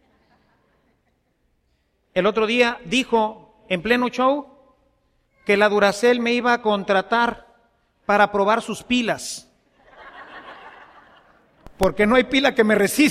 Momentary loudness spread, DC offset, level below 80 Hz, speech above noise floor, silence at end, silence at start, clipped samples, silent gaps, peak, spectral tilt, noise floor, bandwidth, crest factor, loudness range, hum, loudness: 16 LU; under 0.1%; -48 dBFS; 48 dB; 0 s; 2.15 s; under 0.1%; none; -2 dBFS; -4 dB/octave; -67 dBFS; 15.5 kHz; 20 dB; 5 LU; none; -19 LUFS